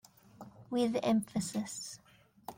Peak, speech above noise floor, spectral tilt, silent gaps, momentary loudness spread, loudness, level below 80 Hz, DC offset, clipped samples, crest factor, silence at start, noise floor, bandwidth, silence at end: -18 dBFS; 22 dB; -5 dB/octave; none; 22 LU; -35 LUFS; -72 dBFS; under 0.1%; under 0.1%; 18 dB; 0.4 s; -55 dBFS; 16.5 kHz; 0.05 s